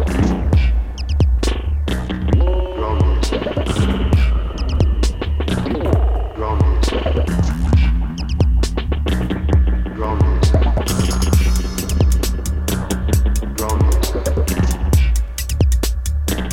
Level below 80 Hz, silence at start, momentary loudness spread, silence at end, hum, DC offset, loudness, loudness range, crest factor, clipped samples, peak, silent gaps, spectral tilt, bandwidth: -18 dBFS; 0 s; 5 LU; 0 s; none; under 0.1%; -18 LUFS; 1 LU; 14 dB; under 0.1%; -2 dBFS; none; -6 dB/octave; 17 kHz